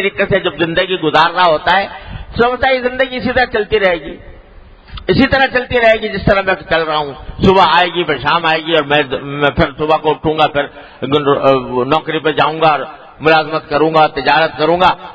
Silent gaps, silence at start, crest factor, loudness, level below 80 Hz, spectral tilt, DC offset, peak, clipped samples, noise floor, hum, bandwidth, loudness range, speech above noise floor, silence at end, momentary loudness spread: none; 0 s; 14 dB; -13 LUFS; -36 dBFS; -6.5 dB/octave; under 0.1%; 0 dBFS; 0.1%; -39 dBFS; none; 8 kHz; 2 LU; 26 dB; 0 s; 7 LU